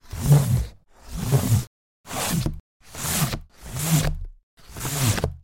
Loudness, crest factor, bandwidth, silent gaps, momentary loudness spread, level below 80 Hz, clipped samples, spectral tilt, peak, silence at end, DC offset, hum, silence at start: -24 LUFS; 18 dB; 17 kHz; 1.67-2.04 s, 2.60-2.80 s, 4.43-4.57 s; 20 LU; -36 dBFS; under 0.1%; -5 dB/octave; -6 dBFS; 0.05 s; under 0.1%; none; 0.1 s